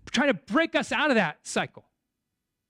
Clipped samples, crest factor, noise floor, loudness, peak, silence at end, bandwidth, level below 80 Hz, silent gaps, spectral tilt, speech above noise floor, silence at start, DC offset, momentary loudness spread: under 0.1%; 16 dB; -83 dBFS; -25 LUFS; -12 dBFS; 1.05 s; 13.5 kHz; -64 dBFS; none; -4 dB/octave; 57 dB; 0.05 s; under 0.1%; 7 LU